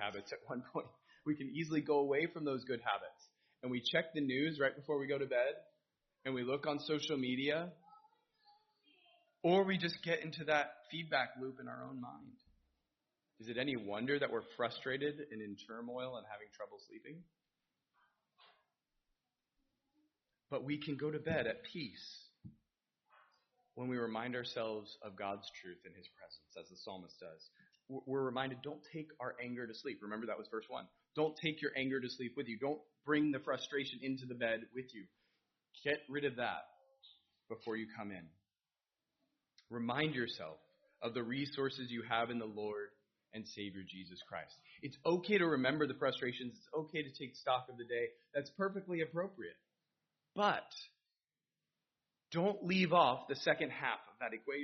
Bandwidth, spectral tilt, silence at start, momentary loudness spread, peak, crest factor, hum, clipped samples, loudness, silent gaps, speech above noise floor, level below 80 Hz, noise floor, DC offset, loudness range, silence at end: 6.2 kHz; -3.5 dB/octave; 0 s; 17 LU; -16 dBFS; 26 dB; none; under 0.1%; -40 LUFS; none; over 50 dB; -82 dBFS; under -90 dBFS; under 0.1%; 8 LU; 0 s